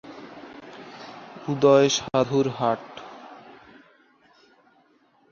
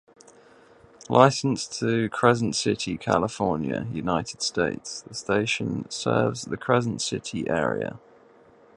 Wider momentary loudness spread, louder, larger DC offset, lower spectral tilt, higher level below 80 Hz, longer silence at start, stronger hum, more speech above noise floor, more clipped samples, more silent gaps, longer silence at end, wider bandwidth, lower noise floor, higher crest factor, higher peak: first, 24 LU vs 10 LU; first, -22 LUFS vs -25 LUFS; neither; about the same, -5 dB/octave vs -5 dB/octave; second, -64 dBFS vs -56 dBFS; second, 0.05 s vs 1.1 s; neither; first, 41 dB vs 30 dB; neither; neither; first, 2 s vs 0.8 s; second, 7.4 kHz vs 11.5 kHz; first, -62 dBFS vs -54 dBFS; about the same, 22 dB vs 26 dB; second, -4 dBFS vs 0 dBFS